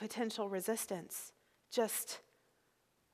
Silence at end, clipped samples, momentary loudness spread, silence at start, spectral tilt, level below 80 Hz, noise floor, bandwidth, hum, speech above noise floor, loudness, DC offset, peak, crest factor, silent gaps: 0.9 s; under 0.1%; 10 LU; 0 s; -3 dB/octave; -88 dBFS; -77 dBFS; 15.5 kHz; none; 37 dB; -40 LUFS; under 0.1%; -20 dBFS; 20 dB; none